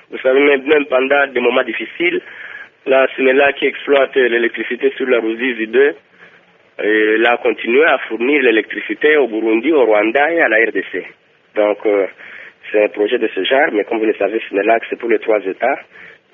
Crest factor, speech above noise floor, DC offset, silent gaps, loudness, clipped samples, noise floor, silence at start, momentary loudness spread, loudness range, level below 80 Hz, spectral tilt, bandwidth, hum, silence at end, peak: 16 dB; 34 dB; under 0.1%; none; -14 LUFS; under 0.1%; -49 dBFS; 0.1 s; 10 LU; 3 LU; -66 dBFS; -1 dB/octave; 3.8 kHz; none; 0.25 s; 0 dBFS